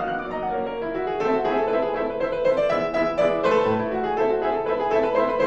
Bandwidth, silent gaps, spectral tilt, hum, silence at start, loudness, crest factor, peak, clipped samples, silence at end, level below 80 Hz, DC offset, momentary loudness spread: 8 kHz; none; -6.5 dB/octave; none; 0 s; -23 LUFS; 14 dB; -8 dBFS; under 0.1%; 0 s; -48 dBFS; under 0.1%; 6 LU